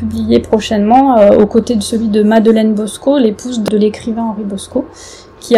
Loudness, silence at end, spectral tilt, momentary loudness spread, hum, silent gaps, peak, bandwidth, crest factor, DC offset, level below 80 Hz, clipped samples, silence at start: -12 LUFS; 0 s; -6 dB/octave; 12 LU; none; none; 0 dBFS; 13.5 kHz; 12 dB; under 0.1%; -40 dBFS; 0.9%; 0 s